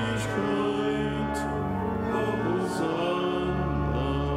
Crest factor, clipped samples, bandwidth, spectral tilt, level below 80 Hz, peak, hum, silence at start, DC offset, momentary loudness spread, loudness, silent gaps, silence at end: 12 dB; under 0.1%; 15 kHz; -6.5 dB/octave; -40 dBFS; -14 dBFS; none; 0 s; under 0.1%; 3 LU; -28 LUFS; none; 0 s